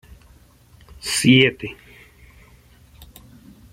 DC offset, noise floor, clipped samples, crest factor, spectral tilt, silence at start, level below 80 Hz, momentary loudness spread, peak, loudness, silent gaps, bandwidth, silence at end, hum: under 0.1%; -51 dBFS; under 0.1%; 22 dB; -4 dB/octave; 1.05 s; -50 dBFS; 21 LU; -2 dBFS; -17 LUFS; none; 16.5 kHz; 2 s; none